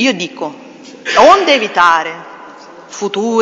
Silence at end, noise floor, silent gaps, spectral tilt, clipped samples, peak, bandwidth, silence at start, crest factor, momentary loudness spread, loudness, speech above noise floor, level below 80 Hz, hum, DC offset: 0 s; -35 dBFS; none; -3 dB/octave; 0.4%; 0 dBFS; 10 kHz; 0 s; 14 dB; 21 LU; -11 LUFS; 23 dB; -52 dBFS; none; under 0.1%